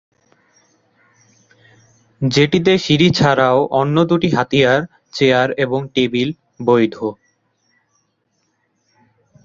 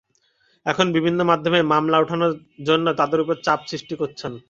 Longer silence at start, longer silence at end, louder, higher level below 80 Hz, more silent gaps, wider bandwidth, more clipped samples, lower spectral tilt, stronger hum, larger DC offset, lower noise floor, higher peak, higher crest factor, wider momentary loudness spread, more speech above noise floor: first, 2.2 s vs 0.65 s; first, 2.3 s vs 0.1 s; first, -15 LUFS vs -20 LUFS; first, -52 dBFS vs -60 dBFS; neither; about the same, 7.8 kHz vs 7.6 kHz; neither; about the same, -6 dB/octave vs -5.5 dB/octave; neither; neither; first, -67 dBFS vs -63 dBFS; about the same, 0 dBFS vs -2 dBFS; about the same, 18 dB vs 20 dB; about the same, 10 LU vs 10 LU; first, 52 dB vs 43 dB